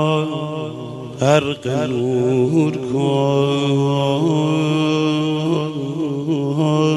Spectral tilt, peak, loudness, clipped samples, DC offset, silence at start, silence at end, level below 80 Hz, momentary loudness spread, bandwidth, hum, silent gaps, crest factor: -7 dB/octave; -2 dBFS; -18 LUFS; under 0.1%; under 0.1%; 0 s; 0 s; -56 dBFS; 7 LU; 12 kHz; none; none; 16 dB